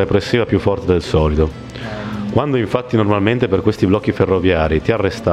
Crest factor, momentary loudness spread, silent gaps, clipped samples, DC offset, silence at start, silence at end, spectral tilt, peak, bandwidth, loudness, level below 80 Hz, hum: 14 dB; 6 LU; none; under 0.1%; under 0.1%; 0 s; 0 s; -7.5 dB/octave; -2 dBFS; 12 kHz; -16 LUFS; -30 dBFS; none